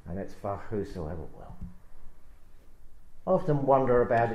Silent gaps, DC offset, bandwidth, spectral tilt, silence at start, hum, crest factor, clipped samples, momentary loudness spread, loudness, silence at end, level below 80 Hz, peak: none; under 0.1%; 10 kHz; -9 dB/octave; 0.05 s; none; 20 dB; under 0.1%; 23 LU; -28 LUFS; 0 s; -46 dBFS; -10 dBFS